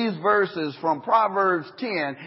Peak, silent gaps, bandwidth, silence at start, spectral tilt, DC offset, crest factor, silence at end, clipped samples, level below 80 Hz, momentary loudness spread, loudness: -6 dBFS; none; 5.8 kHz; 0 s; -10 dB/octave; under 0.1%; 16 dB; 0 s; under 0.1%; -72 dBFS; 6 LU; -23 LUFS